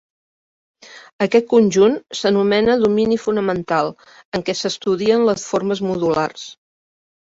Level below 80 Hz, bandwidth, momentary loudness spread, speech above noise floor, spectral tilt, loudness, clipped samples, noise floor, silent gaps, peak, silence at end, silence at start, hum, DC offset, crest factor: -54 dBFS; 8 kHz; 10 LU; over 73 dB; -5 dB/octave; -18 LUFS; under 0.1%; under -90 dBFS; 1.13-1.19 s, 4.25-4.32 s; -2 dBFS; 0.7 s; 0.9 s; none; under 0.1%; 16 dB